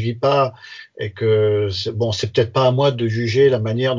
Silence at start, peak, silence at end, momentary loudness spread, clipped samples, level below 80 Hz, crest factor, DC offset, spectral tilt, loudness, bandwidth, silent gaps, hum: 0 s; -2 dBFS; 0 s; 10 LU; under 0.1%; -46 dBFS; 16 dB; under 0.1%; -6.5 dB/octave; -18 LUFS; 7.6 kHz; none; none